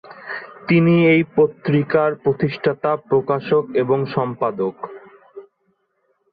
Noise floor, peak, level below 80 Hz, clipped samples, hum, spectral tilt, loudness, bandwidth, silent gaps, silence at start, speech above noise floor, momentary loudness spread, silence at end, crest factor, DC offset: -67 dBFS; -4 dBFS; -58 dBFS; under 0.1%; none; -10.5 dB/octave; -18 LUFS; 5 kHz; none; 0.1 s; 49 dB; 16 LU; 0.9 s; 16 dB; under 0.1%